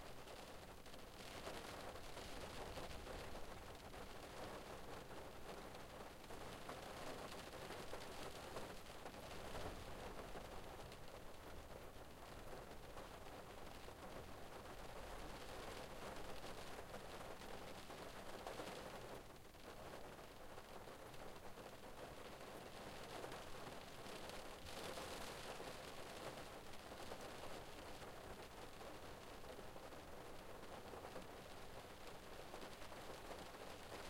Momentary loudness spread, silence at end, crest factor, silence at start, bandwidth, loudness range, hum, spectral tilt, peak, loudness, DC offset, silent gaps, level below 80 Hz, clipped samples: 5 LU; 0 s; 18 dB; 0 s; 16 kHz; 4 LU; none; -4 dB/octave; -36 dBFS; -55 LUFS; under 0.1%; none; -62 dBFS; under 0.1%